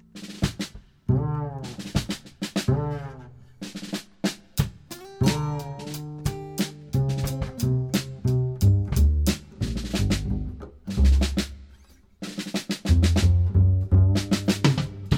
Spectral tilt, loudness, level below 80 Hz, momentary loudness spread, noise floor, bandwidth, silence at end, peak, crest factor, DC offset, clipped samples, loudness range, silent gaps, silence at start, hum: -6 dB/octave; -25 LUFS; -30 dBFS; 15 LU; -53 dBFS; 17.5 kHz; 0 s; -6 dBFS; 18 dB; under 0.1%; under 0.1%; 7 LU; none; 0.15 s; none